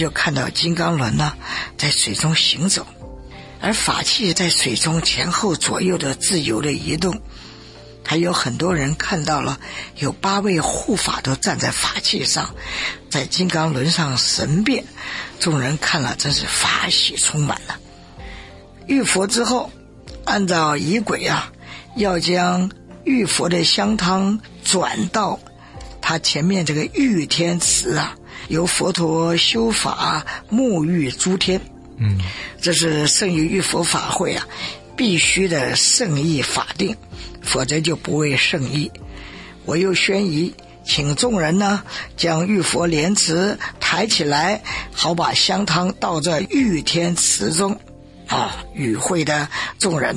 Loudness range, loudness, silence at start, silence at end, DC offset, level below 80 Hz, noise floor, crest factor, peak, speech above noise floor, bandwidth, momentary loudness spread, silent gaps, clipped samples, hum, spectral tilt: 3 LU; -18 LUFS; 0 s; 0 s; under 0.1%; -42 dBFS; -40 dBFS; 16 dB; -2 dBFS; 21 dB; 11.5 kHz; 11 LU; none; under 0.1%; none; -3.5 dB/octave